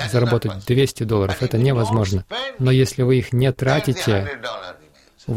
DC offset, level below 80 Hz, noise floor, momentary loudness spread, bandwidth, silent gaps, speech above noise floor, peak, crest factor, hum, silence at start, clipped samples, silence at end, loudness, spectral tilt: under 0.1%; -44 dBFS; -51 dBFS; 11 LU; 15.5 kHz; none; 32 dB; -6 dBFS; 14 dB; none; 0 s; under 0.1%; 0 s; -20 LUFS; -6.5 dB/octave